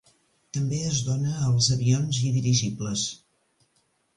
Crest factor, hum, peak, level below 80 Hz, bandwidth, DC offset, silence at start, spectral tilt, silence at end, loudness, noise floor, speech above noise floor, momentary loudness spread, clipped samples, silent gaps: 16 dB; none; -10 dBFS; -54 dBFS; 11 kHz; under 0.1%; 0.55 s; -4.5 dB/octave; 1 s; -25 LUFS; -69 dBFS; 45 dB; 9 LU; under 0.1%; none